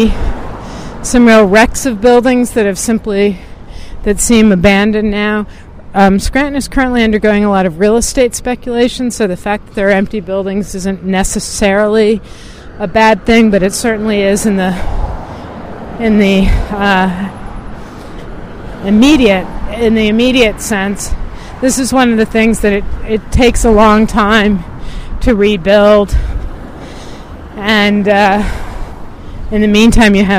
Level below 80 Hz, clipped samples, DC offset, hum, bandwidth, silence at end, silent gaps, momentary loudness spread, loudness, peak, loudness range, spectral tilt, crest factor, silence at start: -22 dBFS; 0.1%; under 0.1%; none; 16 kHz; 0 s; none; 19 LU; -11 LUFS; 0 dBFS; 4 LU; -5 dB/octave; 10 dB; 0 s